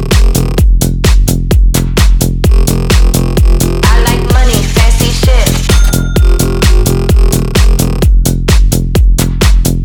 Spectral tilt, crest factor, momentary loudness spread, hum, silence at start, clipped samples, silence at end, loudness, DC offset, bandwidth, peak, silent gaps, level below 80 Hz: -5 dB/octave; 6 dB; 1 LU; none; 0 s; 0.3%; 0 s; -10 LUFS; under 0.1%; 19 kHz; 0 dBFS; none; -8 dBFS